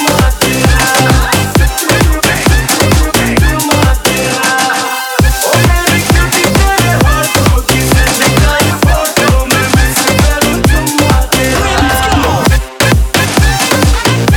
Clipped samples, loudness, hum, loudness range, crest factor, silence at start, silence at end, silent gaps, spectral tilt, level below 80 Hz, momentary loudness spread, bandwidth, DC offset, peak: 0.3%; -9 LUFS; none; 1 LU; 8 dB; 0 s; 0 s; none; -4 dB/octave; -16 dBFS; 2 LU; over 20 kHz; under 0.1%; 0 dBFS